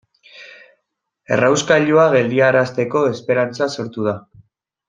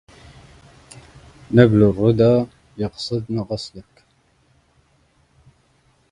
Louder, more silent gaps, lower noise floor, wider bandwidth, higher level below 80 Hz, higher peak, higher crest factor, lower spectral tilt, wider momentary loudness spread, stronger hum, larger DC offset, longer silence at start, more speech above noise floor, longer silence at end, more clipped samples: about the same, -16 LUFS vs -18 LUFS; neither; first, -75 dBFS vs -60 dBFS; second, 9.4 kHz vs 11 kHz; second, -62 dBFS vs -48 dBFS; about the same, -2 dBFS vs 0 dBFS; second, 16 dB vs 22 dB; second, -5 dB/octave vs -8 dB/octave; second, 10 LU vs 15 LU; neither; neither; second, 0.35 s vs 1.5 s; first, 59 dB vs 43 dB; second, 0.7 s vs 2.3 s; neither